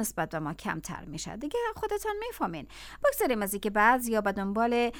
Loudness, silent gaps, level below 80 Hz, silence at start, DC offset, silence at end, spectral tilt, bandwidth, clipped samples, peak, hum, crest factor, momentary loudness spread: -30 LUFS; none; -52 dBFS; 0 s; under 0.1%; 0 s; -4 dB/octave; over 20 kHz; under 0.1%; -10 dBFS; none; 20 dB; 14 LU